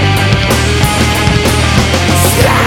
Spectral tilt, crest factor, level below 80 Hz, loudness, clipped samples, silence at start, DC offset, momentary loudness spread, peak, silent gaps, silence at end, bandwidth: -4.5 dB/octave; 10 dB; -20 dBFS; -10 LUFS; under 0.1%; 0 s; under 0.1%; 2 LU; 0 dBFS; none; 0 s; 19 kHz